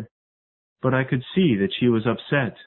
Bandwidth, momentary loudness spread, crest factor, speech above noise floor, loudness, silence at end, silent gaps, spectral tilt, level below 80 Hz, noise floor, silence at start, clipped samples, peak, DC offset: 4.2 kHz; 3 LU; 18 dB; over 69 dB; -22 LUFS; 0.05 s; 0.11-0.76 s; -11.5 dB/octave; -56 dBFS; under -90 dBFS; 0 s; under 0.1%; -6 dBFS; under 0.1%